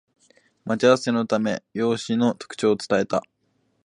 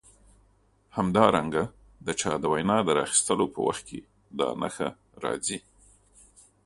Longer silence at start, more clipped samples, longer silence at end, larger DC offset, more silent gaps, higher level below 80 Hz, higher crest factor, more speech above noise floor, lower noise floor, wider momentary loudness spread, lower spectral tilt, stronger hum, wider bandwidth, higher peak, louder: second, 0.65 s vs 0.95 s; neither; second, 0.65 s vs 1.05 s; neither; neither; second, -66 dBFS vs -58 dBFS; about the same, 20 dB vs 24 dB; first, 47 dB vs 38 dB; first, -69 dBFS vs -64 dBFS; second, 8 LU vs 15 LU; first, -5.5 dB/octave vs -4 dB/octave; neither; about the same, 11 kHz vs 11.5 kHz; about the same, -4 dBFS vs -4 dBFS; first, -23 LUFS vs -27 LUFS